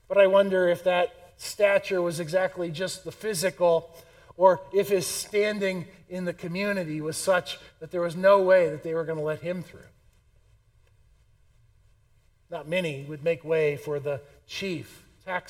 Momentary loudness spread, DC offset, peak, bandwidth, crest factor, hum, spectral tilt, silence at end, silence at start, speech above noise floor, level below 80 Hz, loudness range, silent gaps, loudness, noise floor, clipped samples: 16 LU; under 0.1%; -6 dBFS; 16.5 kHz; 20 dB; none; -4.5 dB/octave; 0.1 s; 0.1 s; 37 dB; -62 dBFS; 11 LU; none; -26 LUFS; -62 dBFS; under 0.1%